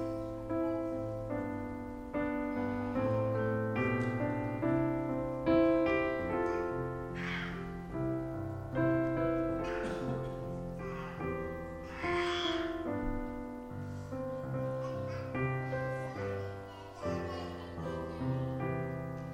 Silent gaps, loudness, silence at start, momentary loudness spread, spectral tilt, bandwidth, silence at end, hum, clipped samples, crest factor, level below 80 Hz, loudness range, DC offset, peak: none; -36 LUFS; 0 s; 9 LU; -7.5 dB/octave; 11.5 kHz; 0 s; none; under 0.1%; 18 dB; -52 dBFS; 6 LU; under 0.1%; -18 dBFS